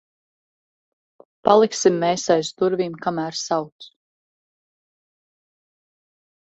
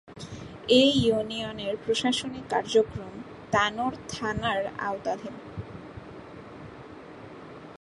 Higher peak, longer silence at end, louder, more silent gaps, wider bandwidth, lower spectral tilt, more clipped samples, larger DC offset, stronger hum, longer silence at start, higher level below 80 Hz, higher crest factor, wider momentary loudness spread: first, 0 dBFS vs -8 dBFS; first, 2.65 s vs 0.05 s; first, -20 LUFS vs -26 LUFS; first, 3.72-3.79 s vs none; second, 8.2 kHz vs 11.5 kHz; about the same, -4.5 dB/octave vs -4.5 dB/octave; neither; neither; neither; first, 1.45 s vs 0.05 s; second, -66 dBFS vs -54 dBFS; about the same, 24 dB vs 20 dB; second, 9 LU vs 22 LU